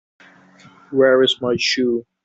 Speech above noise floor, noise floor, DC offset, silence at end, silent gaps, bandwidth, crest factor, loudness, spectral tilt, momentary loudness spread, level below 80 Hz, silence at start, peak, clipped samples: 31 dB; -48 dBFS; under 0.1%; 0.25 s; none; 8 kHz; 16 dB; -17 LUFS; -4 dB/octave; 7 LU; -62 dBFS; 0.9 s; -2 dBFS; under 0.1%